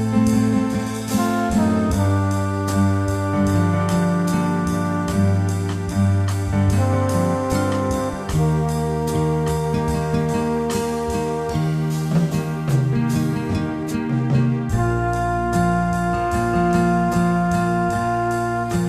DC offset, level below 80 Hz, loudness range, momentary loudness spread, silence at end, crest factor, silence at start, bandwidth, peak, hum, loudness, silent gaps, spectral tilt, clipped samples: under 0.1%; -36 dBFS; 2 LU; 4 LU; 0 s; 12 dB; 0 s; 14 kHz; -6 dBFS; none; -20 LUFS; none; -7 dB/octave; under 0.1%